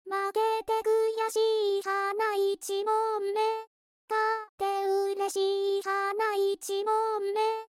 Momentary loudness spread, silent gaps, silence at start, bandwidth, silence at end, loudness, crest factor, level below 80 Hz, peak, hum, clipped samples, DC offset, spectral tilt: 4 LU; 3.67-4.08 s, 4.49-4.58 s; 0.05 s; 16 kHz; 0.05 s; -29 LUFS; 12 dB; -76 dBFS; -16 dBFS; none; under 0.1%; under 0.1%; -1 dB/octave